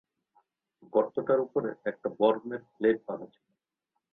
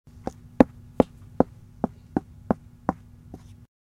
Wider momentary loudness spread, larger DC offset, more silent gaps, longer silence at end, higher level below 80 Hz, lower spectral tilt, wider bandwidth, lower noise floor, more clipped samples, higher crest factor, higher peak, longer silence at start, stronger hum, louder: second, 13 LU vs 23 LU; neither; neither; about the same, 0.85 s vs 0.9 s; second, -74 dBFS vs -46 dBFS; about the same, -9.5 dB/octave vs -9 dB/octave; second, 4.1 kHz vs 11 kHz; first, -84 dBFS vs -46 dBFS; neither; second, 20 dB vs 28 dB; second, -12 dBFS vs 0 dBFS; first, 0.95 s vs 0.6 s; neither; second, -30 LUFS vs -27 LUFS